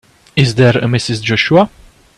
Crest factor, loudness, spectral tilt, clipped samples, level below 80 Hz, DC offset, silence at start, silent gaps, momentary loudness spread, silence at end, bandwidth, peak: 14 dB; -13 LUFS; -6 dB/octave; under 0.1%; -44 dBFS; under 0.1%; 0.35 s; none; 7 LU; 0.5 s; 11.5 kHz; 0 dBFS